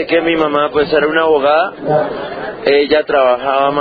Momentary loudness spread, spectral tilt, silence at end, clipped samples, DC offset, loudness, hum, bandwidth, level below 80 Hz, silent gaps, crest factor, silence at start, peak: 6 LU; -7.5 dB/octave; 0 s; under 0.1%; under 0.1%; -13 LUFS; none; 5 kHz; -46 dBFS; none; 14 dB; 0 s; 0 dBFS